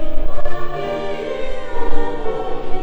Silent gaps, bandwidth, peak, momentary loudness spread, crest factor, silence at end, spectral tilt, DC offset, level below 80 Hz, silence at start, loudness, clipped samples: none; 4.3 kHz; 0 dBFS; 3 LU; 10 dB; 0 s; -6.5 dB/octave; under 0.1%; -22 dBFS; 0 s; -25 LUFS; under 0.1%